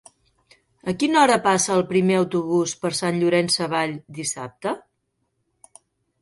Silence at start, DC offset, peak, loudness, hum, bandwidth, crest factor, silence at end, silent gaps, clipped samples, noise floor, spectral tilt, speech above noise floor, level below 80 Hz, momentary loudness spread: 0.85 s; under 0.1%; -4 dBFS; -21 LUFS; none; 11.5 kHz; 18 dB; 1.4 s; none; under 0.1%; -73 dBFS; -4 dB/octave; 53 dB; -64 dBFS; 12 LU